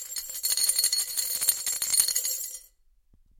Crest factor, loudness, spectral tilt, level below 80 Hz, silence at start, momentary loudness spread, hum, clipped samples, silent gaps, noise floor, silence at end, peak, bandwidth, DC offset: 24 dB; -24 LUFS; 3.5 dB/octave; -64 dBFS; 0 s; 11 LU; none; under 0.1%; none; -62 dBFS; 0.75 s; -4 dBFS; 17 kHz; under 0.1%